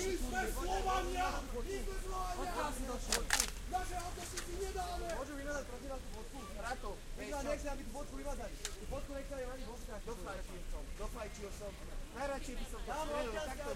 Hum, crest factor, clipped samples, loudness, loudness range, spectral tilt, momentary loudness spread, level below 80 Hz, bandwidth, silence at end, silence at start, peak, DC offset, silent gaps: none; 28 dB; under 0.1%; -42 LUFS; 8 LU; -3 dB/octave; 11 LU; -44 dBFS; 16 kHz; 0 s; 0 s; -12 dBFS; under 0.1%; none